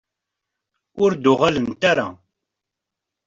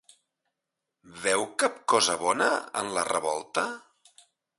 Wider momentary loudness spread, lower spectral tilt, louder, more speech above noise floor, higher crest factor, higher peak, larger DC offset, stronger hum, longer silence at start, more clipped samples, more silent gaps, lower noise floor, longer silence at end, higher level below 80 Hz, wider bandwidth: about the same, 5 LU vs 7 LU; first, -5.5 dB/octave vs -1.5 dB/octave; first, -19 LUFS vs -27 LUFS; first, 66 dB vs 58 dB; about the same, 20 dB vs 22 dB; first, -4 dBFS vs -8 dBFS; neither; neither; about the same, 0.95 s vs 1.05 s; neither; neither; about the same, -84 dBFS vs -86 dBFS; first, 1.1 s vs 0.8 s; first, -56 dBFS vs -70 dBFS; second, 7.6 kHz vs 12 kHz